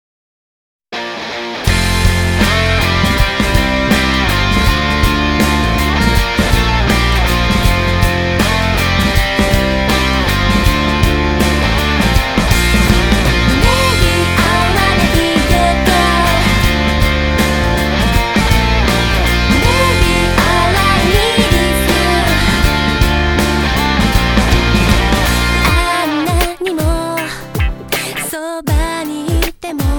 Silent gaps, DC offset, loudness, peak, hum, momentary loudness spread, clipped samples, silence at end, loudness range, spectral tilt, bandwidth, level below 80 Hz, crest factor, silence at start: none; under 0.1%; -13 LUFS; 0 dBFS; none; 6 LU; under 0.1%; 0 s; 3 LU; -4.5 dB/octave; 19.5 kHz; -18 dBFS; 12 dB; 0.9 s